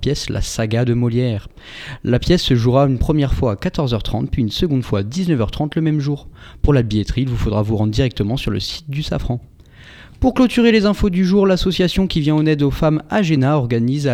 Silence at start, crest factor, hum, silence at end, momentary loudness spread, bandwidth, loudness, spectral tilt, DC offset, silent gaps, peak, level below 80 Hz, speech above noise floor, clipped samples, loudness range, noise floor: 0 s; 16 dB; none; 0 s; 8 LU; 15 kHz; -17 LUFS; -6.5 dB/octave; under 0.1%; none; 0 dBFS; -30 dBFS; 25 dB; under 0.1%; 4 LU; -42 dBFS